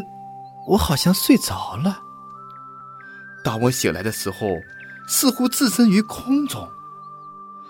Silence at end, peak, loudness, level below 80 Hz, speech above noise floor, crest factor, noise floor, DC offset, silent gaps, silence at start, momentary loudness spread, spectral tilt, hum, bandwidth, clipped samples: 0 s; -2 dBFS; -20 LUFS; -44 dBFS; 20 dB; 20 dB; -39 dBFS; under 0.1%; none; 0 s; 22 LU; -4.5 dB/octave; none; 17 kHz; under 0.1%